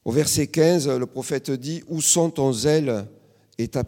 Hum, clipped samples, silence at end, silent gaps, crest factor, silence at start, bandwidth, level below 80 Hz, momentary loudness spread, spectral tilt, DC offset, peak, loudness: none; under 0.1%; 0 s; none; 18 dB; 0.05 s; 17.5 kHz; -54 dBFS; 11 LU; -4.5 dB/octave; under 0.1%; -4 dBFS; -22 LUFS